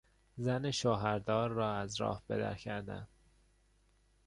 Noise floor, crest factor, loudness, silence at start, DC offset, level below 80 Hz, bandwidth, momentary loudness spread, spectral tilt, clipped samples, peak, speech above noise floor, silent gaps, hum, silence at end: -70 dBFS; 20 dB; -36 LUFS; 0.35 s; under 0.1%; -62 dBFS; 11 kHz; 13 LU; -5.5 dB/octave; under 0.1%; -18 dBFS; 35 dB; none; 50 Hz at -60 dBFS; 1.2 s